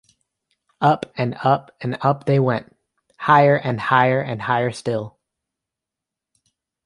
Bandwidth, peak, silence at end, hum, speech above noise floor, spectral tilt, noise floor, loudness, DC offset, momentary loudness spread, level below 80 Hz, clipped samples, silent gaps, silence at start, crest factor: 11 kHz; -2 dBFS; 1.75 s; none; 67 dB; -7 dB/octave; -86 dBFS; -19 LUFS; under 0.1%; 12 LU; -62 dBFS; under 0.1%; none; 0.8 s; 20 dB